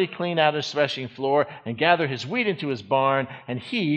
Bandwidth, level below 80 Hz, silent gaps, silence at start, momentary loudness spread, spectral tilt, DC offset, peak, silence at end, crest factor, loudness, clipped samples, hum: 8.8 kHz; -68 dBFS; none; 0 s; 8 LU; -5.5 dB/octave; under 0.1%; -4 dBFS; 0 s; 20 dB; -24 LUFS; under 0.1%; none